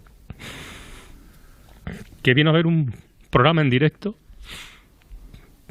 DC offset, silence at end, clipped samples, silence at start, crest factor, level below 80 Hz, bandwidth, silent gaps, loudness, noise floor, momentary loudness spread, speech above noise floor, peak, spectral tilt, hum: under 0.1%; 0.45 s; under 0.1%; 0.4 s; 22 dB; -46 dBFS; 13 kHz; none; -19 LUFS; -48 dBFS; 24 LU; 30 dB; -2 dBFS; -7 dB/octave; none